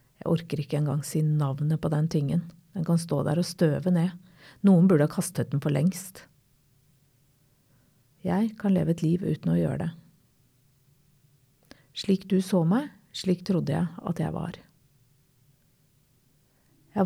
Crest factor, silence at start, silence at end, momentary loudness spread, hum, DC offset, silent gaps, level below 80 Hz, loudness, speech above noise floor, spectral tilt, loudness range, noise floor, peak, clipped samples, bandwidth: 18 dB; 0.25 s; 0 s; 12 LU; none; under 0.1%; none; -60 dBFS; -27 LUFS; 40 dB; -7 dB/octave; 7 LU; -65 dBFS; -10 dBFS; under 0.1%; 14 kHz